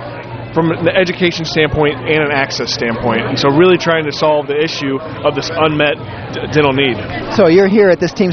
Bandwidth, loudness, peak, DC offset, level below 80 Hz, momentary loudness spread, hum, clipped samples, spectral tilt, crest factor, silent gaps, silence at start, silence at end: 6.6 kHz; -13 LUFS; 0 dBFS; under 0.1%; -40 dBFS; 9 LU; none; under 0.1%; -5.5 dB/octave; 14 dB; none; 0 s; 0 s